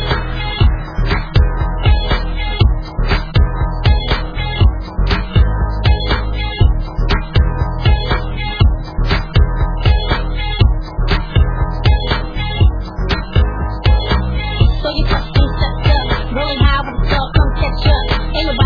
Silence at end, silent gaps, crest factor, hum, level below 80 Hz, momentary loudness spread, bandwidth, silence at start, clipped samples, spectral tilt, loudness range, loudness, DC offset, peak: 0 s; none; 14 dB; none; -16 dBFS; 5 LU; 5.4 kHz; 0 s; under 0.1%; -7.5 dB/octave; 1 LU; -16 LUFS; under 0.1%; 0 dBFS